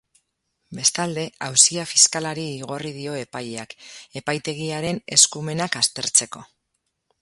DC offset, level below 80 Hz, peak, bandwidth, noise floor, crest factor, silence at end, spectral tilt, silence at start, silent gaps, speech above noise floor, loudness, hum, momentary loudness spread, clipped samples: under 0.1%; -64 dBFS; 0 dBFS; 16 kHz; -76 dBFS; 24 dB; 0.75 s; -1.5 dB/octave; 0.7 s; none; 53 dB; -20 LUFS; none; 19 LU; under 0.1%